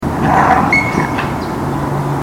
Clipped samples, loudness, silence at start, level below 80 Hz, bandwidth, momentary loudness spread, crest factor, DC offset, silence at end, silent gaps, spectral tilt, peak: under 0.1%; -14 LUFS; 0 s; -32 dBFS; 17 kHz; 8 LU; 14 dB; under 0.1%; 0 s; none; -6.5 dB/octave; 0 dBFS